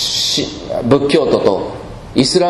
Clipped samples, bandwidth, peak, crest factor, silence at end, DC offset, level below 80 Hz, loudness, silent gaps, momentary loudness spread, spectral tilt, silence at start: 0.1%; 12.5 kHz; 0 dBFS; 14 dB; 0 s; under 0.1%; -40 dBFS; -15 LUFS; none; 9 LU; -4 dB/octave; 0 s